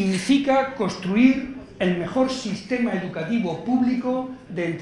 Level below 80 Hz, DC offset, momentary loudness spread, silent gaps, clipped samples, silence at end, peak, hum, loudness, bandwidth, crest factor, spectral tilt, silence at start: -54 dBFS; under 0.1%; 10 LU; none; under 0.1%; 0 s; -4 dBFS; none; -23 LUFS; 11.5 kHz; 18 dB; -6 dB/octave; 0 s